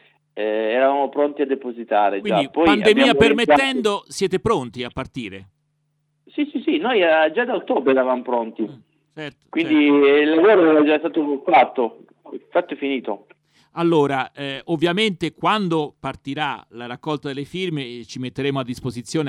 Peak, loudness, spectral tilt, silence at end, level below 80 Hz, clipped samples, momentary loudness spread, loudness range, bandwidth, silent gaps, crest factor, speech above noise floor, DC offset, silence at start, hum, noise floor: 0 dBFS; -19 LUFS; -5.5 dB/octave; 0 s; -54 dBFS; under 0.1%; 17 LU; 7 LU; 12 kHz; none; 20 dB; 50 dB; under 0.1%; 0.35 s; none; -69 dBFS